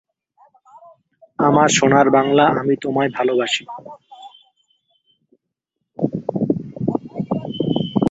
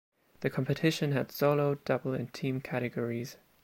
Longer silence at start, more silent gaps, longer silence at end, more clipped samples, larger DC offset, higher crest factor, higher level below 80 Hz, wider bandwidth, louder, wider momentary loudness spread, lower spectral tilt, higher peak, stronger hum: first, 1.4 s vs 0.4 s; neither; second, 0 s vs 0.3 s; neither; neither; about the same, 18 dB vs 18 dB; first, -56 dBFS vs -68 dBFS; second, 8.2 kHz vs 16.5 kHz; first, -18 LUFS vs -32 LUFS; first, 12 LU vs 8 LU; second, -5 dB/octave vs -6.5 dB/octave; first, -2 dBFS vs -14 dBFS; neither